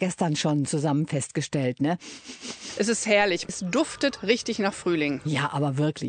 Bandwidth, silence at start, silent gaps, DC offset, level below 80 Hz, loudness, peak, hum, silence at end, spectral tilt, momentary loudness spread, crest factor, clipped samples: 9.4 kHz; 0 s; none; under 0.1%; -64 dBFS; -26 LUFS; -8 dBFS; none; 0 s; -4.5 dB/octave; 9 LU; 18 dB; under 0.1%